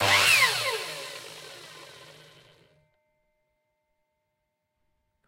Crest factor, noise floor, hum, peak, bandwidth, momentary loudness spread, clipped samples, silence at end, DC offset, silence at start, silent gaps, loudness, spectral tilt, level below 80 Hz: 22 dB; -80 dBFS; none; -8 dBFS; 16 kHz; 26 LU; under 0.1%; 3.45 s; under 0.1%; 0 s; none; -21 LUFS; -0.5 dB/octave; -74 dBFS